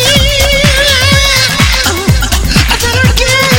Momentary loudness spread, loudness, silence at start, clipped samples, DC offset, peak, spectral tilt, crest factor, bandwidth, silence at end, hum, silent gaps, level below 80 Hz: 4 LU; -7 LUFS; 0 s; 0.7%; under 0.1%; 0 dBFS; -3 dB/octave; 8 dB; 17 kHz; 0 s; none; none; -16 dBFS